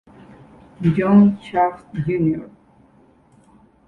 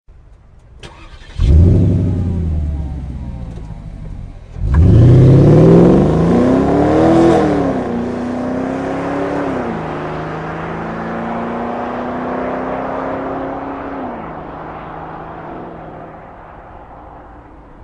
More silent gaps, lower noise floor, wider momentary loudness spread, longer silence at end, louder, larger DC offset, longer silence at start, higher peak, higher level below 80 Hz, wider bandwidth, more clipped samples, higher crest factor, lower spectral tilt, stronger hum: neither; first, -53 dBFS vs -42 dBFS; second, 11 LU vs 23 LU; first, 1.4 s vs 0 s; second, -18 LUFS vs -14 LUFS; neither; first, 0.8 s vs 0.1 s; about the same, -2 dBFS vs 0 dBFS; second, -50 dBFS vs -24 dBFS; second, 4.2 kHz vs 9.6 kHz; neither; about the same, 18 dB vs 14 dB; about the same, -10 dB/octave vs -9.5 dB/octave; neither